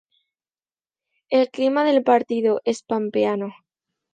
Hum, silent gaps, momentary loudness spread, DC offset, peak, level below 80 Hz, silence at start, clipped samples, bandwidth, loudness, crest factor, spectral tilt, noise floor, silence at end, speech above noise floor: none; none; 7 LU; under 0.1%; -4 dBFS; -74 dBFS; 1.3 s; under 0.1%; 9.4 kHz; -21 LUFS; 18 dB; -5.5 dB/octave; under -90 dBFS; 0.6 s; over 70 dB